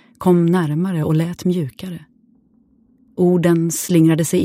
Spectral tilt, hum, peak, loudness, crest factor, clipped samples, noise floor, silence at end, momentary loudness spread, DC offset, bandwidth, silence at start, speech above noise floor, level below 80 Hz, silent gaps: -6.5 dB/octave; none; -2 dBFS; -17 LUFS; 14 dB; under 0.1%; -56 dBFS; 0 s; 17 LU; under 0.1%; 16 kHz; 0.2 s; 40 dB; -56 dBFS; none